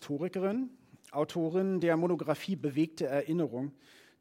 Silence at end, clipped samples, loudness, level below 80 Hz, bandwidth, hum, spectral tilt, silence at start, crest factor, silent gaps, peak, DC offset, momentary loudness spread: 0.5 s; under 0.1%; -33 LUFS; -80 dBFS; 16 kHz; none; -7 dB/octave; 0 s; 18 dB; none; -14 dBFS; under 0.1%; 9 LU